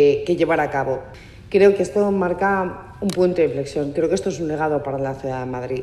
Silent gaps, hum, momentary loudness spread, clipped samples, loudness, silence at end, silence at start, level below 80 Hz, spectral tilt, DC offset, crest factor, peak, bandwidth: none; none; 11 LU; under 0.1%; -21 LUFS; 0 s; 0 s; -48 dBFS; -6.5 dB/octave; under 0.1%; 16 dB; -2 dBFS; 12 kHz